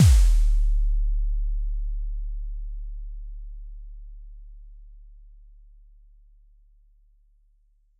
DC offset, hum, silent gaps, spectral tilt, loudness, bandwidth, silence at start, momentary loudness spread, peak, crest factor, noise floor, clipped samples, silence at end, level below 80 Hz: under 0.1%; none; none; -5.5 dB/octave; -28 LUFS; 12.5 kHz; 0 s; 25 LU; -8 dBFS; 18 dB; -62 dBFS; under 0.1%; 2.9 s; -26 dBFS